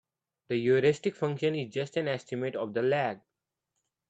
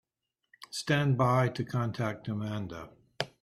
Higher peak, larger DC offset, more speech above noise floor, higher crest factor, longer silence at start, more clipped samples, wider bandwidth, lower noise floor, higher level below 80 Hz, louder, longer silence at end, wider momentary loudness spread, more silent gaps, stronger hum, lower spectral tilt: about the same, -12 dBFS vs -12 dBFS; neither; about the same, 55 dB vs 55 dB; about the same, 18 dB vs 20 dB; about the same, 0.5 s vs 0.6 s; neither; second, 8.2 kHz vs 13.5 kHz; about the same, -84 dBFS vs -85 dBFS; second, -74 dBFS vs -64 dBFS; about the same, -30 LUFS vs -31 LUFS; first, 0.9 s vs 0.15 s; second, 9 LU vs 15 LU; neither; neither; about the same, -6.5 dB/octave vs -6 dB/octave